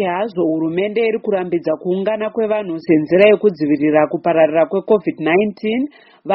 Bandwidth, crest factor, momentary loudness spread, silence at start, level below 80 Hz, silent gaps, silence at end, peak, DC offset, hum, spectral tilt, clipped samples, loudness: 5.8 kHz; 16 dB; 8 LU; 0 s; -60 dBFS; none; 0 s; 0 dBFS; under 0.1%; none; -5 dB/octave; under 0.1%; -16 LUFS